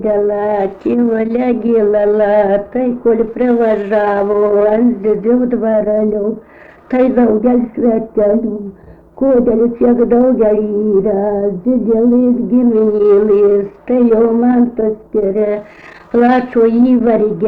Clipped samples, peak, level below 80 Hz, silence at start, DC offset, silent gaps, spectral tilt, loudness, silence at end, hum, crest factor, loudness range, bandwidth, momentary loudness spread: under 0.1%; -2 dBFS; -42 dBFS; 0 s; under 0.1%; none; -10 dB/octave; -12 LUFS; 0 s; none; 10 dB; 2 LU; 4.4 kHz; 6 LU